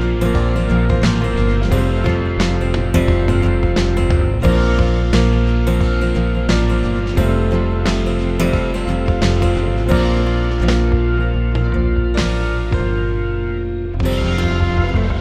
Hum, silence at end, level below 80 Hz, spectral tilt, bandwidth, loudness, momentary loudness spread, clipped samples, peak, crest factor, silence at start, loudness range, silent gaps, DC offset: none; 0 s; -18 dBFS; -7 dB/octave; 13 kHz; -17 LUFS; 4 LU; under 0.1%; -2 dBFS; 14 dB; 0 s; 3 LU; none; 0.2%